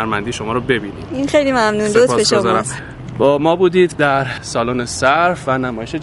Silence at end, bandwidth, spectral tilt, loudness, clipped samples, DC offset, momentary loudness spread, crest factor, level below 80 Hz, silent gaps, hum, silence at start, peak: 0 s; 11.5 kHz; -4.5 dB/octave; -15 LUFS; under 0.1%; under 0.1%; 8 LU; 16 dB; -42 dBFS; none; none; 0 s; 0 dBFS